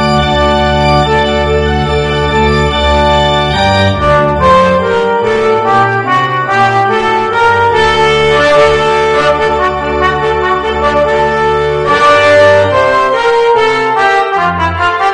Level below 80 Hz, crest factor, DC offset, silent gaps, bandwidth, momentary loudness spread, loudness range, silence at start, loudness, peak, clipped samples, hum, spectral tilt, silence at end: -24 dBFS; 10 dB; under 0.1%; none; 10 kHz; 5 LU; 2 LU; 0 s; -9 LUFS; 0 dBFS; 0.3%; none; -5.5 dB/octave; 0 s